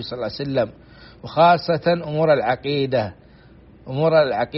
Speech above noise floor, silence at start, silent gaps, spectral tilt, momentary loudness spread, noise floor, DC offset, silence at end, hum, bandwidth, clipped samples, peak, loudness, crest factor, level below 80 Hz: 28 dB; 0 s; none; -4.5 dB/octave; 12 LU; -47 dBFS; under 0.1%; 0 s; none; 5.8 kHz; under 0.1%; -4 dBFS; -20 LUFS; 16 dB; -52 dBFS